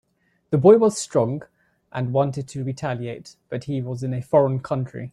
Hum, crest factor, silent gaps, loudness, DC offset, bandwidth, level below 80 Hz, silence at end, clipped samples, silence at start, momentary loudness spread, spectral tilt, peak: none; 20 dB; none; -22 LUFS; under 0.1%; 12 kHz; -60 dBFS; 0.05 s; under 0.1%; 0.5 s; 18 LU; -7 dB/octave; -2 dBFS